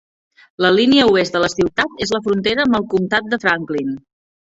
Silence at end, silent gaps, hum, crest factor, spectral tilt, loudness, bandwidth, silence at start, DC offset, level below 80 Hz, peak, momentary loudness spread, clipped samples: 0.6 s; none; none; 16 dB; -4.5 dB/octave; -16 LUFS; 8 kHz; 0.6 s; under 0.1%; -50 dBFS; 0 dBFS; 9 LU; under 0.1%